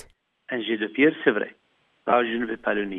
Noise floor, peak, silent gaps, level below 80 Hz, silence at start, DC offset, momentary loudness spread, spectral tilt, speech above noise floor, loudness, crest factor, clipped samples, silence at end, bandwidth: -49 dBFS; -6 dBFS; none; -64 dBFS; 0.5 s; under 0.1%; 12 LU; -7 dB/octave; 26 dB; -24 LUFS; 20 dB; under 0.1%; 0 s; 3.9 kHz